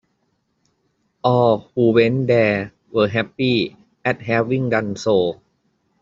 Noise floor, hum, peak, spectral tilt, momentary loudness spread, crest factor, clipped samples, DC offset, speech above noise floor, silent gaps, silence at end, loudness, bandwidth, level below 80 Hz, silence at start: -68 dBFS; none; -2 dBFS; -5 dB/octave; 9 LU; 18 dB; under 0.1%; under 0.1%; 51 dB; none; 0.7 s; -19 LUFS; 7.6 kHz; -58 dBFS; 1.25 s